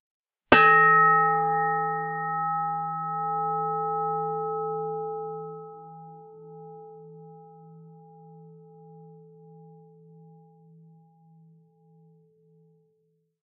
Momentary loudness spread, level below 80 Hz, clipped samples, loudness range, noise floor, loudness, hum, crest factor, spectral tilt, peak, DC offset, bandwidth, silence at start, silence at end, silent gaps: 29 LU; -64 dBFS; under 0.1%; 27 LU; -72 dBFS; -23 LUFS; none; 26 dB; 1 dB/octave; -2 dBFS; under 0.1%; 2.8 kHz; 0.5 s; 3.8 s; none